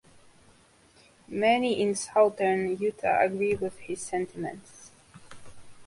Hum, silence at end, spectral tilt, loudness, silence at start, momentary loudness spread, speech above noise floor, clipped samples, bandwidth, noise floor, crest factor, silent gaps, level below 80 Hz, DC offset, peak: none; 0 s; -4.5 dB/octave; -27 LUFS; 1.3 s; 13 LU; 33 dB; under 0.1%; 11.5 kHz; -59 dBFS; 20 dB; none; -62 dBFS; under 0.1%; -10 dBFS